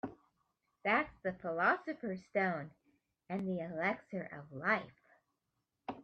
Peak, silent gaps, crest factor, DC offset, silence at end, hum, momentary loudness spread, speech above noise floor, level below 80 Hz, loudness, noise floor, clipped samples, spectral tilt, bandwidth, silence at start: -18 dBFS; none; 22 dB; under 0.1%; 0 s; none; 15 LU; 49 dB; -74 dBFS; -37 LUFS; -86 dBFS; under 0.1%; -7.5 dB/octave; 6.6 kHz; 0.05 s